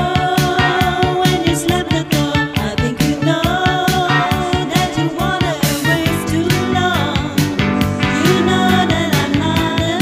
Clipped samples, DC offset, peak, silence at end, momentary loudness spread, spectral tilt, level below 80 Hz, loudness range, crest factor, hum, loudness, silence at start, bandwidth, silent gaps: under 0.1%; under 0.1%; 0 dBFS; 0 s; 4 LU; -5 dB/octave; -32 dBFS; 1 LU; 16 dB; none; -15 LUFS; 0 s; 15.5 kHz; none